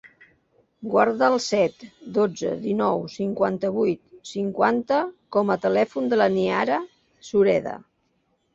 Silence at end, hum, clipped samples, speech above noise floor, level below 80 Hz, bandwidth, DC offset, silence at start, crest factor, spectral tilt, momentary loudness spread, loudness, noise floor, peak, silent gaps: 0.7 s; none; under 0.1%; 47 dB; -64 dBFS; 7.8 kHz; under 0.1%; 0.8 s; 20 dB; -5.5 dB/octave; 9 LU; -23 LUFS; -69 dBFS; -4 dBFS; none